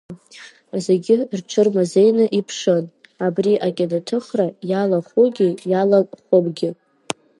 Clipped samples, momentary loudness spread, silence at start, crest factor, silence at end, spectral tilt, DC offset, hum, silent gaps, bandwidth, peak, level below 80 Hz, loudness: under 0.1%; 11 LU; 0.1 s; 18 dB; 0.65 s; -6.5 dB/octave; under 0.1%; none; none; 11.5 kHz; 0 dBFS; -70 dBFS; -19 LUFS